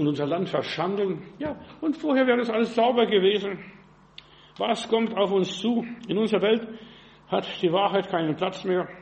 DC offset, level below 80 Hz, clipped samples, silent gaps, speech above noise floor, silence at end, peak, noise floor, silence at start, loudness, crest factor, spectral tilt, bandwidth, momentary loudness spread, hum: under 0.1%; -64 dBFS; under 0.1%; none; 26 dB; 0 s; -8 dBFS; -50 dBFS; 0 s; -25 LUFS; 16 dB; -6 dB/octave; 8.4 kHz; 10 LU; none